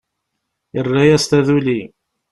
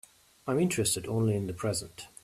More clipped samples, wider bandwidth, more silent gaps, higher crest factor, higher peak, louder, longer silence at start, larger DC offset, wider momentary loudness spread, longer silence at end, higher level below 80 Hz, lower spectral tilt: neither; second, 12.5 kHz vs 15 kHz; neither; about the same, 16 dB vs 16 dB; first, -2 dBFS vs -14 dBFS; first, -15 LUFS vs -30 LUFS; first, 0.75 s vs 0.45 s; neither; about the same, 11 LU vs 10 LU; first, 0.45 s vs 0.15 s; first, -48 dBFS vs -60 dBFS; about the same, -5.5 dB/octave vs -5 dB/octave